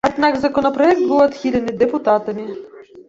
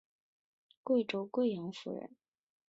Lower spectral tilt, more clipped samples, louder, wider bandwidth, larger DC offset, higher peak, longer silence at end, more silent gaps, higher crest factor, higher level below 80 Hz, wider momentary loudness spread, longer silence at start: about the same, -6 dB/octave vs -6.5 dB/octave; neither; first, -16 LUFS vs -36 LUFS; about the same, 7.8 kHz vs 7.8 kHz; neither; first, -2 dBFS vs -20 dBFS; second, 0.05 s vs 0.6 s; neither; about the same, 16 dB vs 18 dB; first, -50 dBFS vs -84 dBFS; about the same, 13 LU vs 15 LU; second, 0.05 s vs 0.85 s